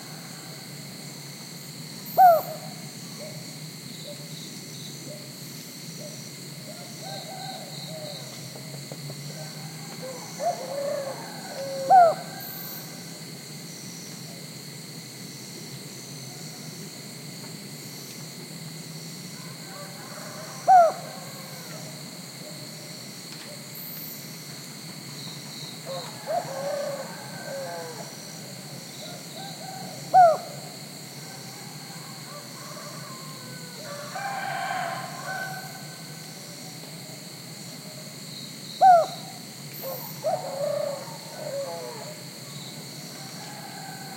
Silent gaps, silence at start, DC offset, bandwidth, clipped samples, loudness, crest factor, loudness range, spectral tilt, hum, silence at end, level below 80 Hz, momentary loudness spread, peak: none; 0 s; under 0.1%; 16.5 kHz; under 0.1%; -30 LUFS; 22 dB; 13 LU; -3.5 dB/octave; none; 0 s; -78 dBFS; 17 LU; -6 dBFS